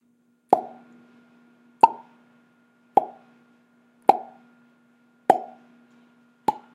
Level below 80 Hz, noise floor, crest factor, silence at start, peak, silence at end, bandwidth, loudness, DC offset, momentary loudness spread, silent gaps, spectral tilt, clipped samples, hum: -76 dBFS; -65 dBFS; 28 dB; 0.5 s; 0 dBFS; 0.2 s; 15 kHz; -23 LUFS; under 0.1%; 23 LU; none; -5.5 dB/octave; under 0.1%; 60 Hz at -60 dBFS